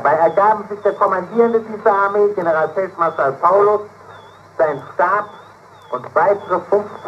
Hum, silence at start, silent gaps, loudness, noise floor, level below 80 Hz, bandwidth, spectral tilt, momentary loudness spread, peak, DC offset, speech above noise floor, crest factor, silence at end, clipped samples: none; 0 s; none; -16 LUFS; -42 dBFS; -66 dBFS; 8.2 kHz; -7 dB/octave; 7 LU; 0 dBFS; under 0.1%; 26 dB; 16 dB; 0 s; under 0.1%